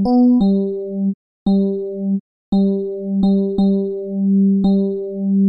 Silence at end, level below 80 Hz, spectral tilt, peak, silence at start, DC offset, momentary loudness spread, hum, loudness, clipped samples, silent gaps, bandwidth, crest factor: 0 s; -46 dBFS; -12 dB/octave; -6 dBFS; 0 s; under 0.1%; 9 LU; 50 Hz at -35 dBFS; -18 LUFS; under 0.1%; 1.14-1.46 s, 2.20-2.52 s; 5.4 kHz; 10 dB